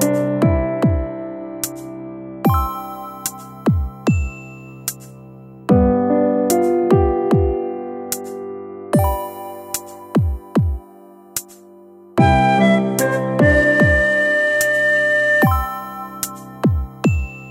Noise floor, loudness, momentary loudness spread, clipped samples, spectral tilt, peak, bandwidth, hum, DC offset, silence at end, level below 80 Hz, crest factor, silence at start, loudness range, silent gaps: -43 dBFS; -18 LUFS; 16 LU; under 0.1%; -6 dB/octave; -2 dBFS; 16.5 kHz; none; under 0.1%; 0 s; -30 dBFS; 16 dB; 0 s; 8 LU; none